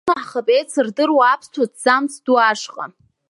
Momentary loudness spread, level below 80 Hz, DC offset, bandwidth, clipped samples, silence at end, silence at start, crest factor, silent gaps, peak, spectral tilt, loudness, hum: 11 LU; -70 dBFS; under 0.1%; 11.5 kHz; under 0.1%; 0.45 s; 0.05 s; 18 dB; none; 0 dBFS; -3 dB/octave; -17 LUFS; none